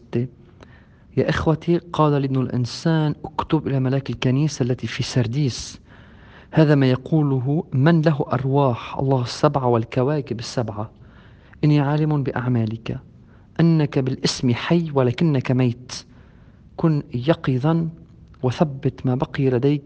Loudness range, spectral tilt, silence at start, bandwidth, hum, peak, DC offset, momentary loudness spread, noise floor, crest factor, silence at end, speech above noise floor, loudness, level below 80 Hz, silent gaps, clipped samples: 4 LU; -7 dB/octave; 0.15 s; 9 kHz; none; 0 dBFS; under 0.1%; 9 LU; -48 dBFS; 20 dB; 0.05 s; 28 dB; -21 LUFS; -50 dBFS; none; under 0.1%